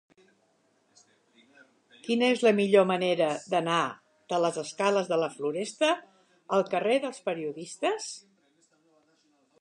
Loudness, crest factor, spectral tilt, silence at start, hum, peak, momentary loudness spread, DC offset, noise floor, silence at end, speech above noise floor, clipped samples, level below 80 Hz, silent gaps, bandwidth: -27 LUFS; 20 dB; -4.5 dB/octave; 2.05 s; none; -10 dBFS; 12 LU; under 0.1%; -69 dBFS; 1.4 s; 42 dB; under 0.1%; -82 dBFS; none; 11 kHz